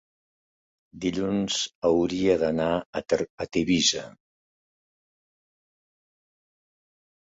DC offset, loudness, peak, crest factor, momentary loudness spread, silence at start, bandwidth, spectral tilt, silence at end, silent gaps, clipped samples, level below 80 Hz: under 0.1%; -25 LUFS; -8 dBFS; 20 dB; 8 LU; 0.95 s; 8 kHz; -4 dB/octave; 3.1 s; 1.75-1.82 s, 2.86-2.93 s, 3.30-3.38 s; under 0.1%; -56 dBFS